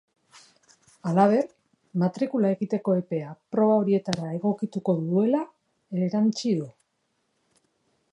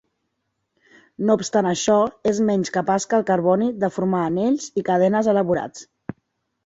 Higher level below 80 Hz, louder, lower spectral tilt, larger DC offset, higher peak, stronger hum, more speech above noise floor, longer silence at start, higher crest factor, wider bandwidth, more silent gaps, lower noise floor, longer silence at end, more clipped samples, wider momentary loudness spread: second, -72 dBFS vs -60 dBFS; second, -25 LUFS vs -20 LUFS; first, -7.5 dB/octave vs -5.5 dB/octave; neither; about the same, -4 dBFS vs -4 dBFS; neither; second, 50 dB vs 56 dB; second, 0.35 s vs 1.2 s; first, 22 dB vs 16 dB; first, 10.5 kHz vs 8 kHz; neither; about the same, -74 dBFS vs -75 dBFS; first, 1.45 s vs 0.55 s; neither; first, 11 LU vs 7 LU